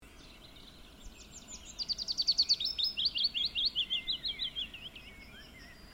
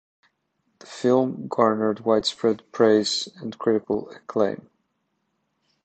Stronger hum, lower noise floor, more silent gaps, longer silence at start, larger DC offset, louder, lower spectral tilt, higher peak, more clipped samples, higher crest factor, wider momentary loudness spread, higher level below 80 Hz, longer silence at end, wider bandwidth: neither; second, -54 dBFS vs -74 dBFS; neither; second, 0 s vs 0.9 s; neither; second, -31 LUFS vs -23 LUFS; second, -0.5 dB/octave vs -5 dB/octave; second, -18 dBFS vs -4 dBFS; neither; about the same, 18 dB vs 22 dB; first, 24 LU vs 10 LU; first, -58 dBFS vs -64 dBFS; second, 0 s vs 1.3 s; first, 16.5 kHz vs 9 kHz